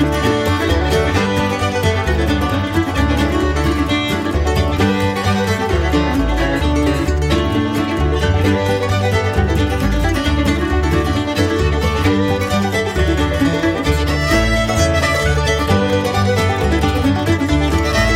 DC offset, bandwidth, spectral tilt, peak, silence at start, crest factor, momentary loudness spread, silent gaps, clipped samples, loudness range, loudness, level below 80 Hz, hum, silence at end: under 0.1%; 16 kHz; -5.5 dB/octave; -2 dBFS; 0 s; 12 dB; 2 LU; none; under 0.1%; 1 LU; -16 LUFS; -22 dBFS; none; 0 s